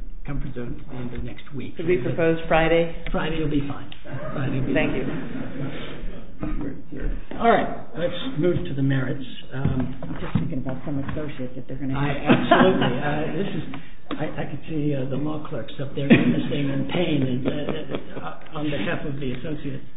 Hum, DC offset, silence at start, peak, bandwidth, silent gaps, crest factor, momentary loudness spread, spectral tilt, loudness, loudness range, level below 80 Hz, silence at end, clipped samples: none; 5%; 0 s; -2 dBFS; 4 kHz; none; 22 dB; 15 LU; -11.5 dB/octave; -25 LUFS; 5 LU; -38 dBFS; 0.05 s; under 0.1%